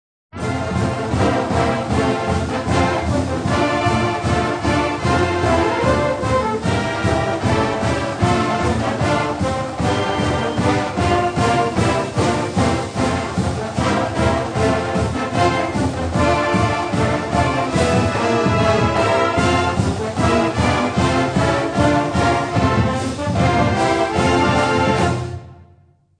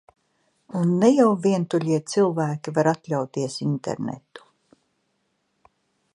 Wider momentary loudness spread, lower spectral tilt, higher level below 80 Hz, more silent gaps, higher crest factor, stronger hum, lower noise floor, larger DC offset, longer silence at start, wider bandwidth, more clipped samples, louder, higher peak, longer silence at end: second, 4 LU vs 12 LU; about the same, -6 dB/octave vs -6.5 dB/octave; first, -34 dBFS vs -68 dBFS; neither; second, 14 dB vs 20 dB; neither; second, -52 dBFS vs -72 dBFS; neither; second, 0.35 s vs 0.7 s; about the same, 10 kHz vs 11 kHz; neither; first, -18 LUFS vs -23 LUFS; about the same, -2 dBFS vs -4 dBFS; second, 0.65 s vs 1.75 s